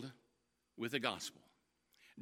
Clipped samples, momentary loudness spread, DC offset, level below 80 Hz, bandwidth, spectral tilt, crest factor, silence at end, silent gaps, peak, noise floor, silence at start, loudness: under 0.1%; 16 LU; under 0.1%; -88 dBFS; 16.5 kHz; -3.5 dB/octave; 28 dB; 0 s; none; -20 dBFS; -82 dBFS; 0 s; -41 LUFS